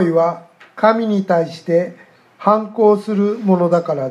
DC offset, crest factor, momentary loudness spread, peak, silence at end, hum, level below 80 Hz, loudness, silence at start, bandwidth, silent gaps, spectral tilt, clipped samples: under 0.1%; 16 dB; 5 LU; 0 dBFS; 0 s; none; -72 dBFS; -16 LUFS; 0 s; 11 kHz; none; -8 dB/octave; under 0.1%